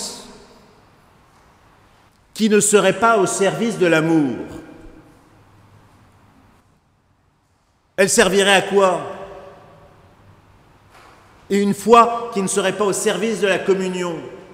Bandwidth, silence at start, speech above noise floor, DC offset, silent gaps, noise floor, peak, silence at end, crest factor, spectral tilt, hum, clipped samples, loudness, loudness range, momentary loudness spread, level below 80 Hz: 16 kHz; 0 s; 45 dB; under 0.1%; none; -61 dBFS; 0 dBFS; 0.1 s; 20 dB; -3.5 dB/octave; none; under 0.1%; -17 LUFS; 6 LU; 19 LU; -54 dBFS